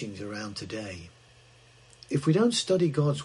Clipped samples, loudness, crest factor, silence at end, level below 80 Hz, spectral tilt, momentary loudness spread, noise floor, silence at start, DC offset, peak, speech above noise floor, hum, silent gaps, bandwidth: under 0.1%; -28 LUFS; 18 dB; 0 s; -64 dBFS; -5.5 dB/octave; 14 LU; -56 dBFS; 0 s; under 0.1%; -12 dBFS; 29 dB; none; none; 11.5 kHz